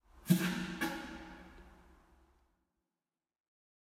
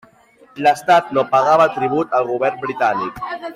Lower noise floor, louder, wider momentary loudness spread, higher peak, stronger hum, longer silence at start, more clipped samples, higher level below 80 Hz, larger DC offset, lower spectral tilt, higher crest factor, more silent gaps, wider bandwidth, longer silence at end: first, under -90 dBFS vs -50 dBFS; second, -36 LUFS vs -17 LUFS; first, 22 LU vs 8 LU; second, -16 dBFS vs -4 dBFS; neither; second, 0.15 s vs 0.55 s; neither; second, -64 dBFS vs -58 dBFS; neither; about the same, -5.5 dB/octave vs -5 dB/octave; first, 26 dB vs 14 dB; neither; about the same, 16 kHz vs 15 kHz; first, 2.25 s vs 0 s